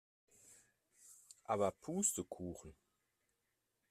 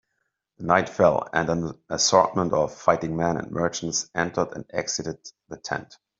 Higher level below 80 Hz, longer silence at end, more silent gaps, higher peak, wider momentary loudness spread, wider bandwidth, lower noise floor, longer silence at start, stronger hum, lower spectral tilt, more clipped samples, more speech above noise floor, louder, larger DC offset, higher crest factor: second, -74 dBFS vs -56 dBFS; first, 1.2 s vs 0.35 s; neither; second, -22 dBFS vs -2 dBFS; first, 24 LU vs 13 LU; first, 15.5 kHz vs 7.8 kHz; first, -86 dBFS vs -77 dBFS; about the same, 0.5 s vs 0.6 s; neither; about the same, -4 dB/octave vs -4 dB/octave; neither; second, 45 dB vs 53 dB; second, -40 LUFS vs -24 LUFS; neither; about the same, 22 dB vs 22 dB